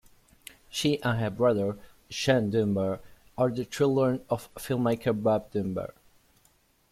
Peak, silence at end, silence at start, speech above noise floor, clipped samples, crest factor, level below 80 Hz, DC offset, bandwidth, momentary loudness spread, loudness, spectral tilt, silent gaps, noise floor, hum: -10 dBFS; 1 s; 0.75 s; 39 dB; under 0.1%; 20 dB; -58 dBFS; under 0.1%; 16 kHz; 12 LU; -28 LUFS; -6 dB/octave; none; -65 dBFS; none